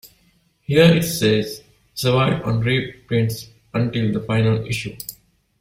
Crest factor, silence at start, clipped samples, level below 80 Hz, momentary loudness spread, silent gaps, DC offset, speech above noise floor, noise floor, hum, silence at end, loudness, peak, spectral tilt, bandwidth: 18 dB; 0.05 s; under 0.1%; -48 dBFS; 18 LU; none; under 0.1%; 42 dB; -60 dBFS; none; 0.5 s; -19 LUFS; -2 dBFS; -6 dB/octave; 16 kHz